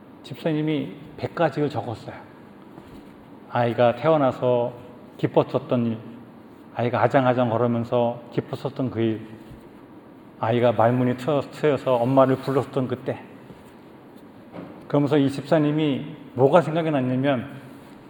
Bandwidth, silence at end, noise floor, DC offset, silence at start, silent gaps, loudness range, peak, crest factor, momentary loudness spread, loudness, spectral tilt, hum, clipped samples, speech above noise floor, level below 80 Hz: 19 kHz; 0.15 s; -46 dBFS; under 0.1%; 0.1 s; none; 4 LU; -2 dBFS; 22 dB; 21 LU; -23 LUFS; -8 dB/octave; none; under 0.1%; 24 dB; -64 dBFS